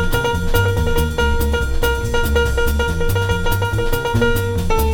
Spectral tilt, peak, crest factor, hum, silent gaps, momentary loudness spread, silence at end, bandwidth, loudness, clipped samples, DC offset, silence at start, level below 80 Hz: -5.5 dB/octave; -2 dBFS; 14 dB; none; none; 2 LU; 0 s; 18.5 kHz; -18 LUFS; under 0.1%; under 0.1%; 0 s; -20 dBFS